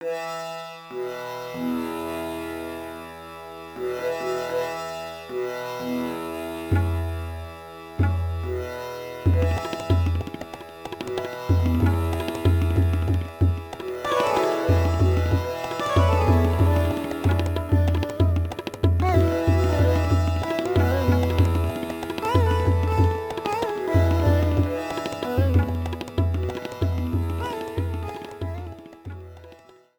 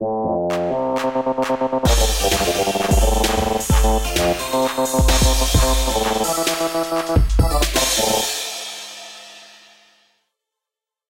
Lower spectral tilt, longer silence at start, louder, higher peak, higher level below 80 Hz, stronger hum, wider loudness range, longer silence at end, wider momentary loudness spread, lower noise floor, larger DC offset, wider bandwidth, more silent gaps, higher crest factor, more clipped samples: first, -7.5 dB/octave vs -4 dB/octave; about the same, 0 s vs 0 s; second, -24 LUFS vs -18 LUFS; second, -6 dBFS vs -2 dBFS; second, -34 dBFS vs -24 dBFS; neither; first, 8 LU vs 4 LU; second, 0.45 s vs 1.65 s; first, 14 LU vs 7 LU; second, -50 dBFS vs -87 dBFS; neither; first, 19 kHz vs 17 kHz; neither; about the same, 18 dB vs 16 dB; neither